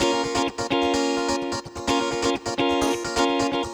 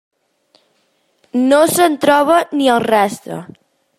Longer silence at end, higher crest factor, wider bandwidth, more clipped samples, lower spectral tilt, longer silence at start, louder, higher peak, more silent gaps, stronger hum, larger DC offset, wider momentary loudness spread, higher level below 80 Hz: second, 0 s vs 0.55 s; about the same, 16 dB vs 14 dB; first, over 20 kHz vs 16 kHz; neither; about the same, -3.5 dB/octave vs -4 dB/octave; second, 0 s vs 1.35 s; second, -24 LUFS vs -13 LUFS; second, -8 dBFS vs -2 dBFS; neither; neither; neither; second, 3 LU vs 15 LU; first, -48 dBFS vs -62 dBFS